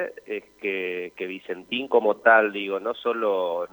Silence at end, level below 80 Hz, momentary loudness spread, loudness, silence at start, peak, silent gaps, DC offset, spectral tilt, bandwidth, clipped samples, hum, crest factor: 0.05 s; -72 dBFS; 16 LU; -24 LUFS; 0 s; -4 dBFS; none; under 0.1%; -5.5 dB/octave; over 20 kHz; under 0.1%; none; 20 dB